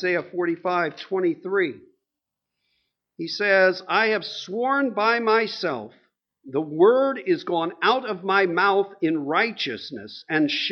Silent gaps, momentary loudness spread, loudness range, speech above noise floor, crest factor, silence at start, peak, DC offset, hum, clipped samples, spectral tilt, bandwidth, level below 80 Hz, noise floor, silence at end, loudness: none; 10 LU; 3 LU; 62 dB; 18 dB; 0 s; -6 dBFS; under 0.1%; none; under 0.1%; -5.5 dB/octave; 6.6 kHz; -76 dBFS; -85 dBFS; 0 s; -22 LUFS